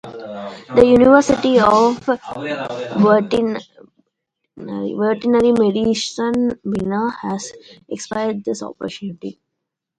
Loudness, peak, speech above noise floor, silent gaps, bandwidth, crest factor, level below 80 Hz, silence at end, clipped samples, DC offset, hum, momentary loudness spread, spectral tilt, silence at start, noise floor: -17 LUFS; 0 dBFS; 62 dB; none; 10.5 kHz; 18 dB; -48 dBFS; 0.65 s; under 0.1%; under 0.1%; none; 18 LU; -5.5 dB/octave; 0.05 s; -79 dBFS